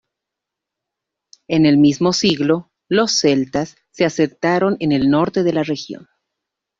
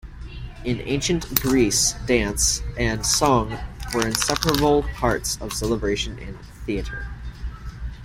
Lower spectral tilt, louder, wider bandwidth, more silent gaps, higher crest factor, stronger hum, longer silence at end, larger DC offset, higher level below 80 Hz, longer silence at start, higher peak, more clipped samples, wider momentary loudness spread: first, -5 dB/octave vs -3.5 dB/octave; first, -17 LUFS vs -22 LUFS; second, 7.6 kHz vs 16.5 kHz; neither; second, 16 dB vs 24 dB; neither; first, 0.75 s vs 0 s; neither; second, -54 dBFS vs -34 dBFS; first, 1.5 s vs 0.05 s; about the same, -2 dBFS vs 0 dBFS; neither; second, 10 LU vs 17 LU